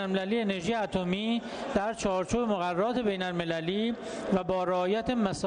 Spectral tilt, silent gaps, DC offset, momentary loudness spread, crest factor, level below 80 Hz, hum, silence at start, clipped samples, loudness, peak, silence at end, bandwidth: -5.5 dB/octave; none; under 0.1%; 3 LU; 14 dB; -54 dBFS; none; 0 s; under 0.1%; -30 LUFS; -14 dBFS; 0 s; 10 kHz